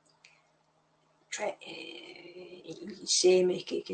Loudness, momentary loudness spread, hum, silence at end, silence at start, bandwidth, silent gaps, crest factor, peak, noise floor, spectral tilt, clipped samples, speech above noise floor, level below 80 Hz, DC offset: -28 LUFS; 24 LU; none; 0 s; 1.3 s; 9 kHz; none; 20 dB; -12 dBFS; -70 dBFS; -3 dB/octave; under 0.1%; 40 dB; -82 dBFS; under 0.1%